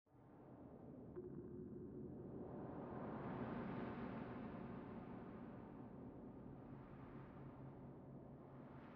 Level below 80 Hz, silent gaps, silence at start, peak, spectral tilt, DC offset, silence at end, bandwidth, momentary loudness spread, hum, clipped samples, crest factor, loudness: -70 dBFS; none; 0.05 s; -36 dBFS; -8 dB/octave; under 0.1%; 0 s; 5.4 kHz; 10 LU; none; under 0.1%; 16 dB; -54 LUFS